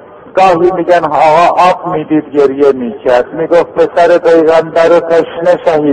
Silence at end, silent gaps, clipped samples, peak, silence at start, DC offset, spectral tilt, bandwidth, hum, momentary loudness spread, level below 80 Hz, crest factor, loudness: 0 s; none; 1%; 0 dBFS; 0.25 s; under 0.1%; -6 dB/octave; 9.2 kHz; none; 5 LU; -46 dBFS; 8 dB; -9 LUFS